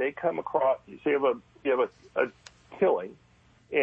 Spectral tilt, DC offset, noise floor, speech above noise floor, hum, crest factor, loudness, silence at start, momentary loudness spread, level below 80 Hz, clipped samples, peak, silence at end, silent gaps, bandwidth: -6 dB/octave; under 0.1%; -49 dBFS; 22 dB; none; 16 dB; -28 LUFS; 0 s; 6 LU; -68 dBFS; under 0.1%; -12 dBFS; 0 s; none; 8.2 kHz